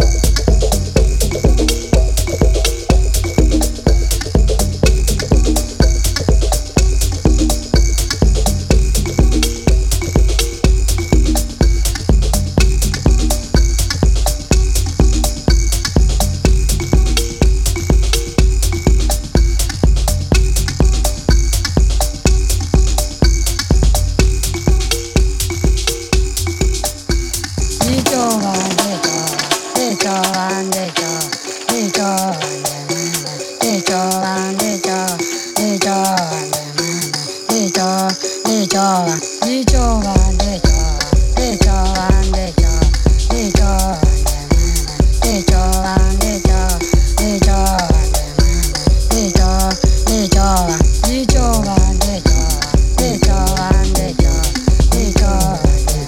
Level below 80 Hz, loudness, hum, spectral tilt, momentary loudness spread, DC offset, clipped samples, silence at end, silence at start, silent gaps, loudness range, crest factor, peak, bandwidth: -14 dBFS; -15 LUFS; none; -4.5 dB/octave; 4 LU; under 0.1%; under 0.1%; 0 s; 0 s; none; 3 LU; 14 dB; 0 dBFS; 16.5 kHz